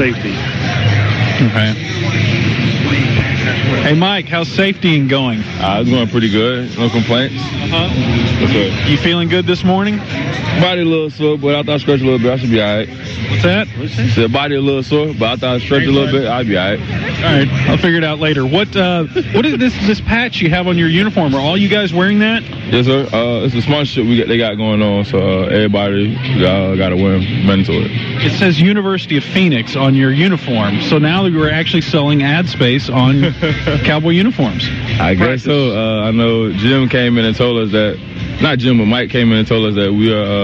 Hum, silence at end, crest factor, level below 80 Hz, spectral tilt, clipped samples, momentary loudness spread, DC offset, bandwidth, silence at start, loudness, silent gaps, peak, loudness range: none; 0 s; 12 dB; -36 dBFS; -7 dB/octave; under 0.1%; 4 LU; under 0.1%; 7.4 kHz; 0 s; -13 LUFS; none; -2 dBFS; 2 LU